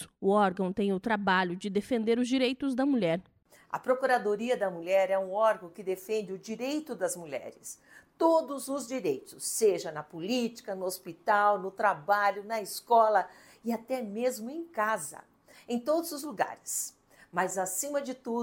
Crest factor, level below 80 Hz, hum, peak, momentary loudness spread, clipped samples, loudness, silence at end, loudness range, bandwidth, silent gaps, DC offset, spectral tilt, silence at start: 18 dB; -72 dBFS; none; -12 dBFS; 11 LU; under 0.1%; -30 LUFS; 0 s; 5 LU; 17 kHz; none; under 0.1%; -4 dB/octave; 0 s